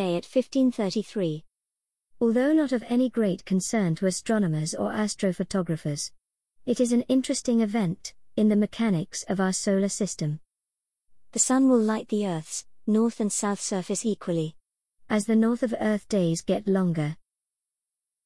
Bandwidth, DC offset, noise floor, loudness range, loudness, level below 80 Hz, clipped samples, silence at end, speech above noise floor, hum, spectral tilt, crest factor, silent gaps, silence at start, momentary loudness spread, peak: 12 kHz; 0.2%; -88 dBFS; 2 LU; -26 LUFS; -62 dBFS; under 0.1%; 1.1 s; 63 dB; none; -5.5 dB/octave; 16 dB; none; 0 s; 9 LU; -10 dBFS